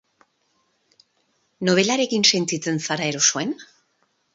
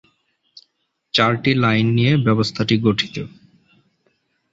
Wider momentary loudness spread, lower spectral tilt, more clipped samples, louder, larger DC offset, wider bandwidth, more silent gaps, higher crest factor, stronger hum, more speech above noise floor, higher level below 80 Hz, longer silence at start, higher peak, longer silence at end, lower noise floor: about the same, 10 LU vs 8 LU; second, -2.5 dB/octave vs -6.5 dB/octave; neither; about the same, -20 LUFS vs -18 LUFS; neither; about the same, 8 kHz vs 8 kHz; neither; about the same, 22 dB vs 18 dB; neither; second, 47 dB vs 53 dB; second, -70 dBFS vs -52 dBFS; first, 1.6 s vs 1.15 s; about the same, -2 dBFS vs -2 dBFS; second, 0.7 s vs 1.25 s; about the same, -68 dBFS vs -70 dBFS